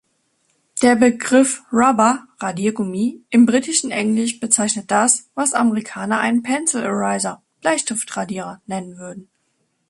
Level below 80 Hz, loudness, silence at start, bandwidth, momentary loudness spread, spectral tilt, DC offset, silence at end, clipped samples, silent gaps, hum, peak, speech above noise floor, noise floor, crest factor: -64 dBFS; -18 LUFS; 0.75 s; 11.5 kHz; 13 LU; -3.5 dB/octave; under 0.1%; 0.65 s; under 0.1%; none; none; 0 dBFS; 50 dB; -68 dBFS; 18 dB